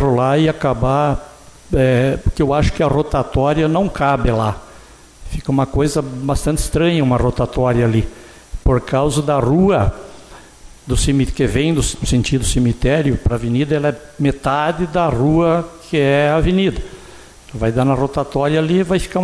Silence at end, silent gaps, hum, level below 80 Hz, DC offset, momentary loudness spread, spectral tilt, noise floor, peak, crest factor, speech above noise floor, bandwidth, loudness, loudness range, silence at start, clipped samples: 0 s; none; none; -28 dBFS; under 0.1%; 7 LU; -6 dB/octave; -41 dBFS; -4 dBFS; 12 dB; 26 dB; 11 kHz; -17 LUFS; 2 LU; 0 s; under 0.1%